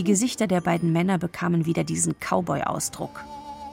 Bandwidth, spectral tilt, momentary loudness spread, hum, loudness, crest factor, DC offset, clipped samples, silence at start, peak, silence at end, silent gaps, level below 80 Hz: 16.5 kHz; -5 dB/octave; 13 LU; none; -24 LUFS; 16 dB; under 0.1%; under 0.1%; 0 s; -8 dBFS; 0 s; none; -56 dBFS